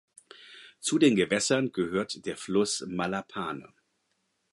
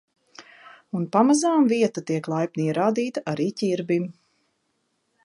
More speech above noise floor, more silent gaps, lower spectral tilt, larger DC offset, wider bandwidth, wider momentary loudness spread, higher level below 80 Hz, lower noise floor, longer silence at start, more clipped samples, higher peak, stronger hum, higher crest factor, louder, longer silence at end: about the same, 48 dB vs 50 dB; neither; second, -4 dB/octave vs -6 dB/octave; neither; about the same, 11.5 kHz vs 11 kHz; first, 17 LU vs 9 LU; first, -66 dBFS vs -74 dBFS; about the same, -76 dBFS vs -73 dBFS; about the same, 0.4 s vs 0.4 s; neither; second, -10 dBFS vs -6 dBFS; neither; about the same, 20 dB vs 20 dB; second, -28 LUFS vs -23 LUFS; second, 0.9 s vs 1.15 s